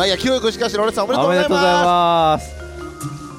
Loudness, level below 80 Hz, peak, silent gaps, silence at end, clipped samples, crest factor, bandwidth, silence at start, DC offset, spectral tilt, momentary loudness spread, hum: -16 LUFS; -40 dBFS; -2 dBFS; none; 0 s; under 0.1%; 14 dB; 16 kHz; 0 s; under 0.1%; -4.5 dB/octave; 16 LU; none